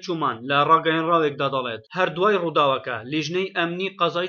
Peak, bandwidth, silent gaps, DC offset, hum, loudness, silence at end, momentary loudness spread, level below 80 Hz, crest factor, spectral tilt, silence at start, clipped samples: -4 dBFS; 7 kHz; none; under 0.1%; none; -22 LUFS; 0 s; 9 LU; -72 dBFS; 18 dB; -5.5 dB/octave; 0 s; under 0.1%